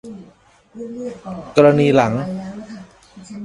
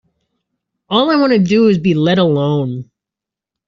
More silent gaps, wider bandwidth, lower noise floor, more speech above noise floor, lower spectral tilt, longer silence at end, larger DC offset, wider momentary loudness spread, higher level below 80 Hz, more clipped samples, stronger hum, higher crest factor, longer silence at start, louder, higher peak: neither; first, 11 kHz vs 7.4 kHz; second, -50 dBFS vs -85 dBFS; second, 34 dB vs 73 dB; first, -7 dB/octave vs -5.5 dB/octave; second, 0 s vs 0.85 s; neither; first, 25 LU vs 7 LU; about the same, -54 dBFS vs -54 dBFS; neither; neither; first, 20 dB vs 12 dB; second, 0.05 s vs 0.9 s; second, -16 LUFS vs -13 LUFS; about the same, 0 dBFS vs -2 dBFS